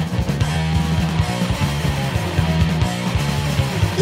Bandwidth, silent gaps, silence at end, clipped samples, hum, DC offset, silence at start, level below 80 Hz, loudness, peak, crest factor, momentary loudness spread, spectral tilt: 16 kHz; none; 0 s; under 0.1%; none; under 0.1%; 0 s; -28 dBFS; -20 LUFS; -4 dBFS; 14 dB; 2 LU; -5.5 dB/octave